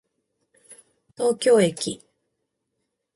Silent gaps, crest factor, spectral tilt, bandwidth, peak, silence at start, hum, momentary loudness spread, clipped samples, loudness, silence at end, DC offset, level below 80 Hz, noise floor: none; 18 dB; -4.5 dB/octave; 11.5 kHz; -8 dBFS; 1.2 s; none; 12 LU; under 0.1%; -21 LUFS; 1.2 s; under 0.1%; -68 dBFS; -78 dBFS